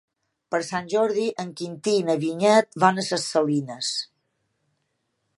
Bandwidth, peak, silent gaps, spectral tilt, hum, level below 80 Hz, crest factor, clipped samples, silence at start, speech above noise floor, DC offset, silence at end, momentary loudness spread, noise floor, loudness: 11.5 kHz; -2 dBFS; none; -4.5 dB/octave; none; -72 dBFS; 22 dB; under 0.1%; 0.5 s; 52 dB; under 0.1%; 1.35 s; 11 LU; -75 dBFS; -23 LUFS